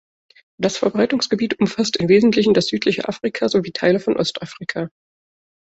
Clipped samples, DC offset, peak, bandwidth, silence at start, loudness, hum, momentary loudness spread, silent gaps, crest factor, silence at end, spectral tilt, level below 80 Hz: under 0.1%; under 0.1%; -4 dBFS; 8.2 kHz; 0.6 s; -19 LUFS; none; 12 LU; none; 16 dB; 0.8 s; -5 dB/octave; -56 dBFS